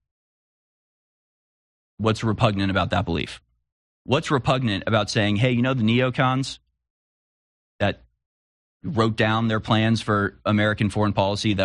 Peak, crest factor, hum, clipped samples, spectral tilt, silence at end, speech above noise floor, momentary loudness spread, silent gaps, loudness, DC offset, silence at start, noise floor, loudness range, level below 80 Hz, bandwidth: -4 dBFS; 20 dB; none; under 0.1%; -6 dB/octave; 0 s; over 69 dB; 7 LU; 3.72-4.05 s, 6.90-7.79 s, 8.26-8.80 s; -22 LUFS; under 0.1%; 2 s; under -90 dBFS; 4 LU; -50 dBFS; 11 kHz